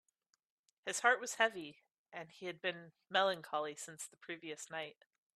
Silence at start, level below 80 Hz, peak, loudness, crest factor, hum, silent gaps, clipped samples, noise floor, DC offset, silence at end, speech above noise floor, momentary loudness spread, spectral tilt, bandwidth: 0.85 s; under -90 dBFS; -14 dBFS; -38 LUFS; 26 dB; none; 1.98-2.05 s; under 0.1%; -84 dBFS; under 0.1%; 0.45 s; 44 dB; 18 LU; -1.5 dB/octave; 14 kHz